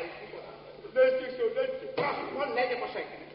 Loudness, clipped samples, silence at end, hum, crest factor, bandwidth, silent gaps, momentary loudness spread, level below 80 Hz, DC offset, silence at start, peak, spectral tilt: -30 LUFS; under 0.1%; 0 s; none; 18 dB; 5.6 kHz; none; 18 LU; -68 dBFS; under 0.1%; 0 s; -12 dBFS; -2 dB/octave